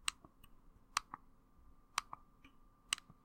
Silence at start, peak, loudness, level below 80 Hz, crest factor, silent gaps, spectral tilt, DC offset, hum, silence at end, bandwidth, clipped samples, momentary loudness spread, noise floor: 0.05 s; -14 dBFS; -43 LUFS; -66 dBFS; 34 dB; none; 1 dB/octave; under 0.1%; none; 0.15 s; 16 kHz; under 0.1%; 17 LU; -65 dBFS